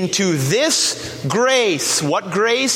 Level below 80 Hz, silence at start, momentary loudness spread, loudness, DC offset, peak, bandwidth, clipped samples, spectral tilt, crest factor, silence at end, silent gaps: -56 dBFS; 0 s; 5 LU; -17 LUFS; under 0.1%; -2 dBFS; 16.5 kHz; under 0.1%; -3 dB/octave; 16 dB; 0 s; none